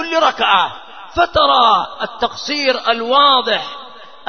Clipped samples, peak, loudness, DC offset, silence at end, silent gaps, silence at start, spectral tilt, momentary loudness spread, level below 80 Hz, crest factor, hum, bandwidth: under 0.1%; 0 dBFS; -14 LUFS; 0.7%; 0.25 s; none; 0 s; -2.5 dB/octave; 13 LU; -46 dBFS; 16 dB; none; 6.6 kHz